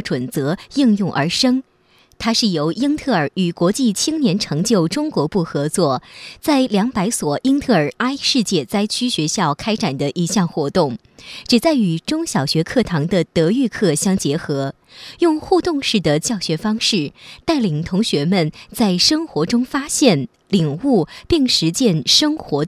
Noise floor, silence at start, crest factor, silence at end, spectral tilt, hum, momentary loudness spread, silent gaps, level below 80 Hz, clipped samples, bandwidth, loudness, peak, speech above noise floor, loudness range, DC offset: -54 dBFS; 0 s; 18 dB; 0 s; -4.5 dB/octave; none; 7 LU; none; -46 dBFS; under 0.1%; 15.5 kHz; -18 LUFS; 0 dBFS; 37 dB; 2 LU; under 0.1%